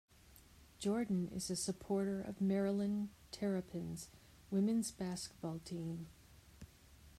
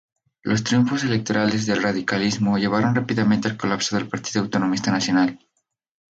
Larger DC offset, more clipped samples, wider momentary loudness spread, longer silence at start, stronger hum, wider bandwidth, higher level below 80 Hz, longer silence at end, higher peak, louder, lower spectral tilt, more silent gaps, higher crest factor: neither; neither; first, 15 LU vs 5 LU; second, 0.3 s vs 0.45 s; neither; first, 14.5 kHz vs 8 kHz; second, -66 dBFS vs -56 dBFS; second, 0.1 s vs 0.75 s; second, -26 dBFS vs -6 dBFS; second, -40 LUFS vs -21 LUFS; about the same, -5.5 dB/octave vs -5 dB/octave; neither; about the same, 14 dB vs 16 dB